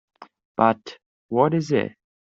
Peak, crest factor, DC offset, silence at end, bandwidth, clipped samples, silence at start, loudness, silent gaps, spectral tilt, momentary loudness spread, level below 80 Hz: -4 dBFS; 20 dB; under 0.1%; 0.35 s; 7.8 kHz; under 0.1%; 0.2 s; -22 LUFS; 0.45-0.55 s, 1.06-1.29 s; -7 dB/octave; 14 LU; -66 dBFS